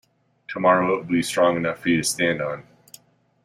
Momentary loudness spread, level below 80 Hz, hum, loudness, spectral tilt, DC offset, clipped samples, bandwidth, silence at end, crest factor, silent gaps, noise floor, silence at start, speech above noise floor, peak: 10 LU; -60 dBFS; none; -21 LUFS; -4 dB/octave; under 0.1%; under 0.1%; 16 kHz; 0.85 s; 18 dB; none; -51 dBFS; 0.5 s; 30 dB; -4 dBFS